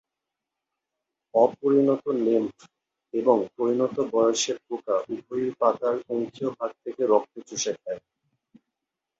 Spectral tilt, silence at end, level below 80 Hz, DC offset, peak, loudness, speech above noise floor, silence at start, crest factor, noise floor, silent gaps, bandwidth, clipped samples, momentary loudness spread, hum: -4.5 dB/octave; 1.2 s; -72 dBFS; under 0.1%; -6 dBFS; -25 LUFS; 61 dB; 1.35 s; 20 dB; -86 dBFS; none; 8 kHz; under 0.1%; 11 LU; none